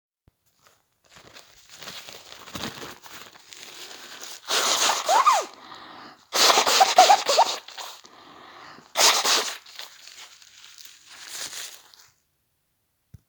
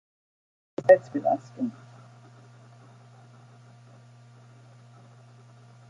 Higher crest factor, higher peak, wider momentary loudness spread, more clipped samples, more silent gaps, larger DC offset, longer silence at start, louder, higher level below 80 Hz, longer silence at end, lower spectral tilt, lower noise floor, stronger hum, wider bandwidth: about the same, 24 dB vs 26 dB; first, -2 dBFS vs -6 dBFS; first, 26 LU vs 19 LU; neither; neither; neither; first, 1.75 s vs 0.8 s; first, -20 LUFS vs -24 LUFS; first, -70 dBFS vs -78 dBFS; second, 1.55 s vs 4.2 s; second, 1 dB/octave vs -7.5 dB/octave; first, -73 dBFS vs -52 dBFS; neither; first, over 20 kHz vs 7.6 kHz